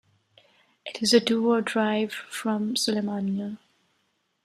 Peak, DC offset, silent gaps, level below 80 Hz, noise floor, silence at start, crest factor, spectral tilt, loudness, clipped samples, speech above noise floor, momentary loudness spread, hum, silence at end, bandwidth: -6 dBFS; under 0.1%; none; -72 dBFS; -73 dBFS; 0.85 s; 20 dB; -4 dB/octave; -25 LUFS; under 0.1%; 48 dB; 16 LU; none; 0.9 s; 14.5 kHz